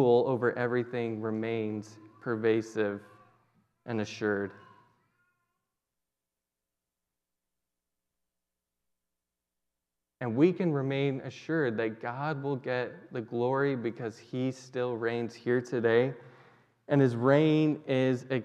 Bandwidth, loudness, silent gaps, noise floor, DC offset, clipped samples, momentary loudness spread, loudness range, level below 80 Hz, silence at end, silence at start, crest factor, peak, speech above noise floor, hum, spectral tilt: 9.2 kHz; -30 LUFS; none; -89 dBFS; under 0.1%; under 0.1%; 12 LU; 11 LU; -84 dBFS; 0 s; 0 s; 20 dB; -10 dBFS; 60 dB; none; -7.5 dB/octave